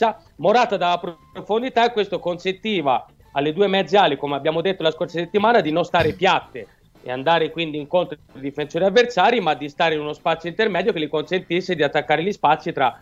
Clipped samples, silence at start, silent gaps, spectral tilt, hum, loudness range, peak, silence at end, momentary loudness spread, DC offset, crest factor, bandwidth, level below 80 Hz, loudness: under 0.1%; 0 s; none; -5.5 dB/octave; none; 2 LU; -2 dBFS; 0.05 s; 9 LU; under 0.1%; 18 dB; 7.8 kHz; -54 dBFS; -20 LUFS